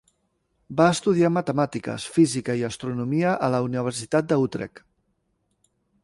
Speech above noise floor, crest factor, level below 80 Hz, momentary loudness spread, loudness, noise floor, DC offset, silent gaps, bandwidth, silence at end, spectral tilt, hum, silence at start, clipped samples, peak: 49 dB; 20 dB; -60 dBFS; 9 LU; -23 LUFS; -72 dBFS; under 0.1%; none; 11.5 kHz; 1.35 s; -6 dB/octave; none; 0.7 s; under 0.1%; -4 dBFS